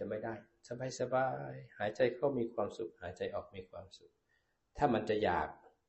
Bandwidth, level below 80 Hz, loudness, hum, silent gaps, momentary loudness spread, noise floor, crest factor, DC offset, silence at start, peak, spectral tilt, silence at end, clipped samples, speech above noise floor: 8.2 kHz; -62 dBFS; -37 LUFS; none; none; 17 LU; -79 dBFS; 22 dB; under 0.1%; 0 s; -16 dBFS; -6 dB/octave; 0.3 s; under 0.1%; 42 dB